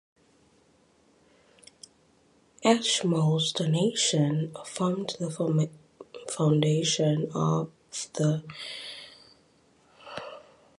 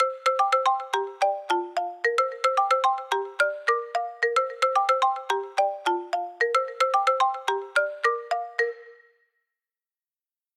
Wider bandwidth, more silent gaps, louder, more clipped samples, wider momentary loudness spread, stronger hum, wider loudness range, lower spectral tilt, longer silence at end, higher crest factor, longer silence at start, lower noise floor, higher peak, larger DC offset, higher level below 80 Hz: second, 11.5 kHz vs 14 kHz; neither; about the same, -27 LUFS vs -25 LUFS; neither; first, 17 LU vs 7 LU; neither; first, 5 LU vs 2 LU; first, -5 dB/octave vs 1 dB/octave; second, 0.4 s vs 1.65 s; first, 22 dB vs 14 dB; first, 2.6 s vs 0 s; second, -63 dBFS vs under -90 dBFS; first, -8 dBFS vs -12 dBFS; neither; first, -70 dBFS vs under -90 dBFS